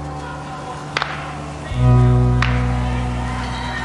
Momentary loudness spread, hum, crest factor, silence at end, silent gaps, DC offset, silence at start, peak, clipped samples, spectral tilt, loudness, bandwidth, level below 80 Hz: 15 LU; none; 18 dB; 0 s; none; under 0.1%; 0 s; -2 dBFS; under 0.1%; -6.5 dB/octave; -20 LUFS; 11 kHz; -26 dBFS